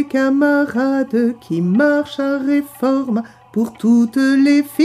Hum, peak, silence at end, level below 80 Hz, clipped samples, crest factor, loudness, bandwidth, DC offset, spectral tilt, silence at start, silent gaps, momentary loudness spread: none; -4 dBFS; 0 s; -62 dBFS; under 0.1%; 12 dB; -16 LUFS; 15 kHz; under 0.1%; -6.5 dB/octave; 0 s; none; 8 LU